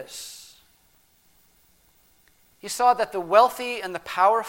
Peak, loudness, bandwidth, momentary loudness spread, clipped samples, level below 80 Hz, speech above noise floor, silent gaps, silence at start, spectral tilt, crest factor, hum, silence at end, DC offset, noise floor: -4 dBFS; -22 LUFS; 17 kHz; 20 LU; under 0.1%; -66 dBFS; 39 dB; none; 0 s; -2 dB/octave; 22 dB; none; 0 s; under 0.1%; -61 dBFS